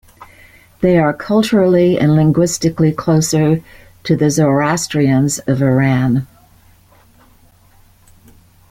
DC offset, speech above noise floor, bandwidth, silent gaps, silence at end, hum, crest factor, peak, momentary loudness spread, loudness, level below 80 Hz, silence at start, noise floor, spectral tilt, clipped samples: under 0.1%; 35 dB; 16 kHz; none; 2.45 s; none; 14 dB; 0 dBFS; 6 LU; -14 LUFS; -44 dBFS; 0.2 s; -48 dBFS; -6 dB/octave; under 0.1%